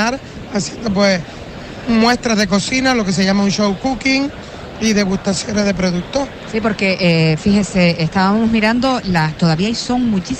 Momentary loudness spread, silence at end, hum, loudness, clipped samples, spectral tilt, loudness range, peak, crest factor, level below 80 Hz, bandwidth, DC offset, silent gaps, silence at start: 8 LU; 0 s; none; -16 LUFS; under 0.1%; -5 dB/octave; 3 LU; -2 dBFS; 14 dB; -38 dBFS; 10.5 kHz; under 0.1%; none; 0 s